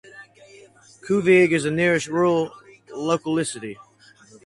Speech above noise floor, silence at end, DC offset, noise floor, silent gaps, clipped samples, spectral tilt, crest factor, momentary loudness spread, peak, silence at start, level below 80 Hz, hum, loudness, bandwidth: 32 dB; 0.7 s; under 0.1%; -52 dBFS; none; under 0.1%; -5.5 dB/octave; 18 dB; 19 LU; -4 dBFS; 0.15 s; -62 dBFS; none; -21 LUFS; 11.5 kHz